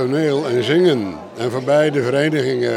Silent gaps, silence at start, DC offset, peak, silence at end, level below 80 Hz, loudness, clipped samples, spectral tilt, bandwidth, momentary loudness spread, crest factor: none; 0 s; under 0.1%; -4 dBFS; 0 s; -62 dBFS; -17 LUFS; under 0.1%; -6 dB/octave; 12.5 kHz; 8 LU; 14 dB